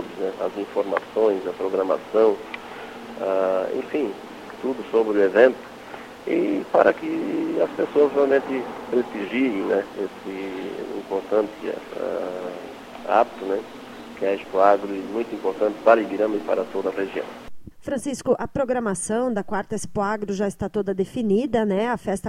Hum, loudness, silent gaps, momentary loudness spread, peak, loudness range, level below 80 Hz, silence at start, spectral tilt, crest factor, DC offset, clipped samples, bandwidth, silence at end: none; -23 LUFS; none; 14 LU; -2 dBFS; 5 LU; -56 dBFS; 0 s; -5.5 dB/octave; 22 dB; under 0.1%; under 0.1%; 15.5 kHz; 0 s